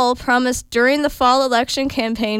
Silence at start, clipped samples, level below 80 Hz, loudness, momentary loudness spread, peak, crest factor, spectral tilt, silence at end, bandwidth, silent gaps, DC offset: 0 s; under 0.1%; -42 dBFS; -17 LUFS; 5 LU; -4 dBFS; 14 dB; -3 dB/octave; 0 s; 16.5 kHz; none; under 0.1%